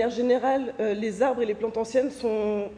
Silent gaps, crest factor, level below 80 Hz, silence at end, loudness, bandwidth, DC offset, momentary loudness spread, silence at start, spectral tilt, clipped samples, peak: none; 14 dB; -58 dBFS; 0 s; -26 LUFS; 10 kHz; under 0.1%; 4 LU; 0 s; -5.5 dB/octave; under 0.1%; -10 dBFS